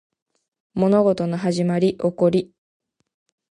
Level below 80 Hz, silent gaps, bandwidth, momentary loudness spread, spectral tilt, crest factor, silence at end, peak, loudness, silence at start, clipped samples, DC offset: -58 dBFS; none; 10.5 kHz; 7 LU; -7.5 dB/octave; 16 dB; 1.05 s; -6 dBFS; -20 LUFS; 0.75 s; under 0.1%; under 0.1%